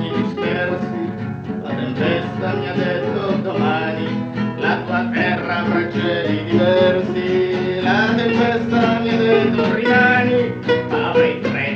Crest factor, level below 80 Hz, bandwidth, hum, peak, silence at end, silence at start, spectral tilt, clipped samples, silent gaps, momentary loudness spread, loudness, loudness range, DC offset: 16 dB; -52 dBFS; 7.2 kHz; none; 0 dBFS; 0 s; 0 s; -7.5 dB/octave; under 0.1%; none; 8 LU; -18 LUFS; 5 LU; under 0.1%